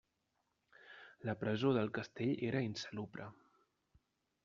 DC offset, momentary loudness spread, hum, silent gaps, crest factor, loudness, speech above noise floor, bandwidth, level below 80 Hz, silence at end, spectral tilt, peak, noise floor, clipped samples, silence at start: under 0.1%; 21 LU; none; none; 20 dB; -39 LUFS; 46 dB; 7.4 kHz; -76 dBFS; 1.1 s; -5.5 dB/octave; -22 dBFS; -84 dBFS; under 0.1%; 0.85 s